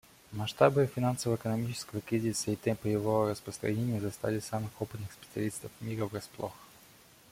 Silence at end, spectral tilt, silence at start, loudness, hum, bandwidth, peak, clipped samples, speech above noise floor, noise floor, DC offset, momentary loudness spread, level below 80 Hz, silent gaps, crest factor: 0.65 s; -6 dB/octave; 0.3 s; -33 LUFS; none; 16.5 kHz; -10 dBFS; under 0.1%; 26 dB; -58 dBFS; under 0.1%; 13 LU; -64 dBFS; none; 24 dB